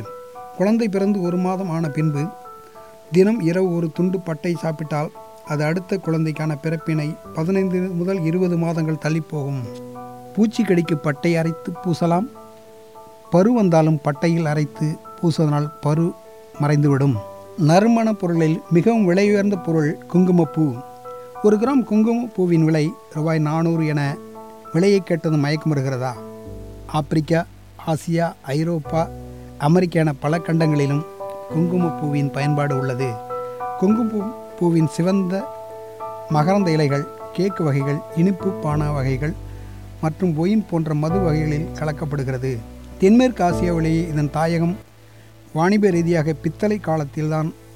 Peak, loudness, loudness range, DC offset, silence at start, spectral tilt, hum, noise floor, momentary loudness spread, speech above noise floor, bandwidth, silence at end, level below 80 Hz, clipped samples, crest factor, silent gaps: -4 dBFS; -20 LUFS; 4 LU; 0.3%; 0 s; -7.5 dB/octave; none; -46 dBFS; 13 LU; 27 dB; 15.5 kHz; 0 s; -44 dBFS; under 0.1%; 16 dB; none